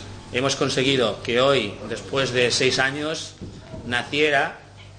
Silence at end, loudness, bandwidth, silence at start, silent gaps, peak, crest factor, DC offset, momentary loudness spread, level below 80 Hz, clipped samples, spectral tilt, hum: 0 s; -21 LUFS; 9.8 kHz; 0 s; none; -6 dBFS; 18 dB; under 0.1%; 15 LU; -50 dBFS; under 0.1%; -3.5 dB/octave; none